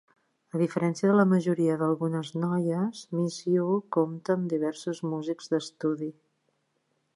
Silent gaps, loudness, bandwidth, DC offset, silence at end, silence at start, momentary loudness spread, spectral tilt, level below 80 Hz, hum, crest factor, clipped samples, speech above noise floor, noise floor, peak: none; -28 LUFS; 11.5 kHz; under 0.1%; 1.05 s; 0.55 s; 9 LU; -7 dB/octave; -76 dBFS; none; 20 dB; under 0.1%; 48 dB; -75 dBFS; -8 dBFS